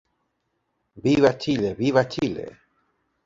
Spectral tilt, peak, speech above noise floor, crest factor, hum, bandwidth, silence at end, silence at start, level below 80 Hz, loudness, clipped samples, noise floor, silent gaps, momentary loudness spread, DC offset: -6.5 dB/octave; -4 dBFS; 53 dB; 22 dB; none; 7.8 kHz; 0.75 s; 0.95 s; -54 dBFS; -22 LUFS; under 0.1%; -75 dBFS; none; 11 LU; under 0.1%